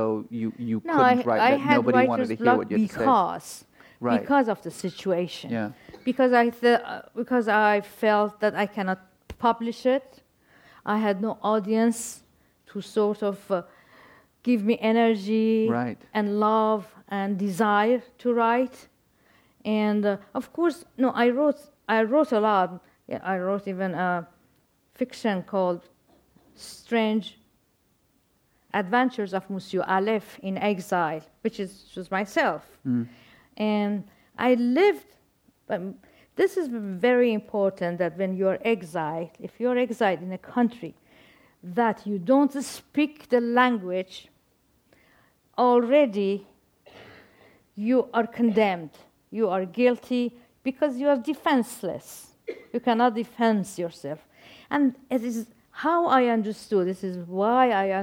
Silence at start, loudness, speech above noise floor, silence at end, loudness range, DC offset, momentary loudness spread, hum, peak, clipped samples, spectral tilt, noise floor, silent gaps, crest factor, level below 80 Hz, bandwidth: 0 s; -25 LUFS; 43 dB; 0 s; 5 LU; under 0.1%; 13 LU; none; -6 dBFS; under 0.1%; -6 dB/octave; -67 dBFS; none; 20 dB; -68 dBFS; 16.5 kHz